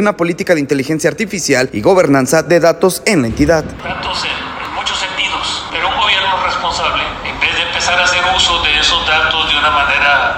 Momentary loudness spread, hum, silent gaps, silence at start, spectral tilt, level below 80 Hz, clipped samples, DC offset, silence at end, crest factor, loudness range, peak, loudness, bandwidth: 7 LU; none; none; 0 s; -3 dB/octave; -34 dBFS; under 0.1%; under 0.1%; 0 s; 14 dB; 4 LU; 0 dBFS; -13 LUFS; 16.5 kHz